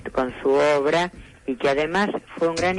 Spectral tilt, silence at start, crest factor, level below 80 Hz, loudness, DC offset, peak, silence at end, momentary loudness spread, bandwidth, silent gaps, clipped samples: -5 dB/octave; 0 s; 12 dB; -50 dBFS; -22 LUFS; under 0.1%; -10 dBFS; 0 s; 10 LU; 11.5 kHz; none; under 0.1%